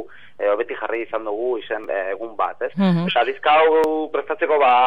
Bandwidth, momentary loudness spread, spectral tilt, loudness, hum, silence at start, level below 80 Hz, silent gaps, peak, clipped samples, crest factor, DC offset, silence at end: 8 kHz; 10 LU; -7.5 dB/octave; -20 LUFS; none; 0 s; -70 dBFS; none; -4 dBFS; under 0.1%; 14 dB; 0.9%; 0 s